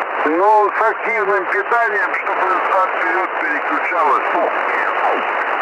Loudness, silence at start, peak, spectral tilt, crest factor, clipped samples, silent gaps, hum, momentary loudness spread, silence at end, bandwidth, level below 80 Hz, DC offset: -16 LUFS; 0 s; -4 dBFS; -4 dB/octave; 14 dB; under 0.1%; none; none; 4 LU; 0 s; 11.5 kHz; -70 dBFS; under 0.1%